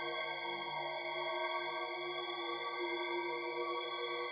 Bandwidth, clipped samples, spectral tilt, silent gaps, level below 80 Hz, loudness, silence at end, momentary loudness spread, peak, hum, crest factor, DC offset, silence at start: 5.2 kHz; under 0.1%; -5.5 dB/octave; none; -82 dBFS; -39 LUFS; 0 s; 2 LU; -26 dBFS; none; 14 dB; under 0.1%; 0 s